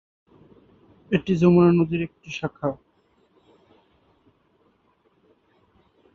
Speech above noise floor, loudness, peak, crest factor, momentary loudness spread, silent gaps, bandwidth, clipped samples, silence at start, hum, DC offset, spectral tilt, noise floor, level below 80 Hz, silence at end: 44 dB; -22 LUFS; -6 dBFS; 20 dB; 15 LU; none; 6.8 kHz; under 0.1%; 1.1 s; none; under 0.1%; -8.5 dB/octave; -65 dBFS; -56 dBFS; 3.4 s